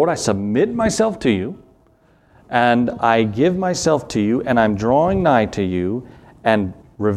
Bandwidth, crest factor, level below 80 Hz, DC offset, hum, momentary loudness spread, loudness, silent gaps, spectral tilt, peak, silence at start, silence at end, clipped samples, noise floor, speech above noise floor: 13 kHz; 18 dB; -44 dBFS; under 0.1%; none; 7 LU; -18 LUFS; none; -5.5 dB/octave; 0 dBFS; 0 s; 0 s; under 0.1%; -54 dBFS; 37 dB